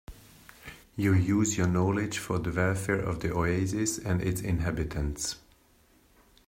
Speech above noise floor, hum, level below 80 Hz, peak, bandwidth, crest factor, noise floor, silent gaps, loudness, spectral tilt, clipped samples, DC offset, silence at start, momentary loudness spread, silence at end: 35 dB; none; -46 dBFS; -12 dBFS; 16 kHz; 16 dB; -63 dBFS; none; -29 LUFS; -5.5 dB/octave; under 0.1%; under 0.1%; 0.1 s; 9 LU; 1.1 s